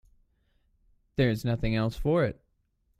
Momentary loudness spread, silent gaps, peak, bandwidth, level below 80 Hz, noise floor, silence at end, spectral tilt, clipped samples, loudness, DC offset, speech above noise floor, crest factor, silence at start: 4 LU; none; -12 dBFS; 14.5 kHz; -44 dBFS; -72 dBFS; 0.65 s; -7.5 dB/octave; under 0.1%; -28 LUFS; under 0.1%; 46 dB; 18 dB; 1.2 s